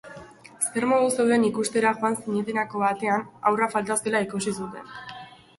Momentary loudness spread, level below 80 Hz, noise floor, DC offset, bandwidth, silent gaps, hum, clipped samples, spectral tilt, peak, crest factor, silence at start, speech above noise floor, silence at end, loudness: 18 LU; -66 dBFS; -45 dBFS; under 0.1%; 12 kHz; none; none; under 0.1%; -4 dB/octave; -6 dBFS; 18 dB; 0.05 s; 21 dB; 0.25 s; -24 LUFS